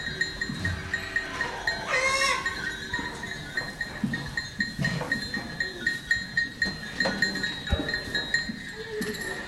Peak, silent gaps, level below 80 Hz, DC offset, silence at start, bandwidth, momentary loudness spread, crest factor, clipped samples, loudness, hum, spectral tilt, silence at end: -12 dBFS; none; -46 dBFS; under 0.1%; 0 s; 16.5 kHz; 7 LU; 18 dB; under 0.1%; -28 LUFS; none; -3.5 dB/octave; 0 s